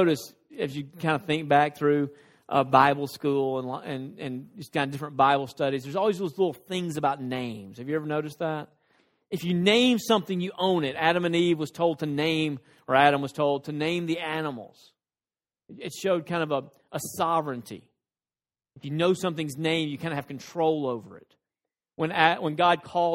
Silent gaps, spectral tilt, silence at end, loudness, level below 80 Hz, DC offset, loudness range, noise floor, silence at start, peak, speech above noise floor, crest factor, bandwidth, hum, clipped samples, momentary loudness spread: none; -5.5 dB/octave; 0 s; -26 LUFS; -68 dBFS; under 0.1%; 6 LU; under -90 dBFS; 0 s; -4 dBFS; over 64 dB; 24 dB; 16.5 kHz; none; under 0.1%; 14 LU